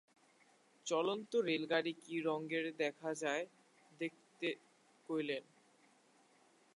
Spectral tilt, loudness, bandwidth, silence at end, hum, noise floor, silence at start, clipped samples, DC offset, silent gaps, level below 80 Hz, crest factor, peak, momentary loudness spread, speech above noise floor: -4 dB/octave; -40 LUFS; 11.5 kHz; 1.35 s; none; -70 dBFS; 0.85 s; under 0.1%; under 0.1%; none; under -90 dBFS; 22 dB; -20 dBFS; 9 LU; 32 dB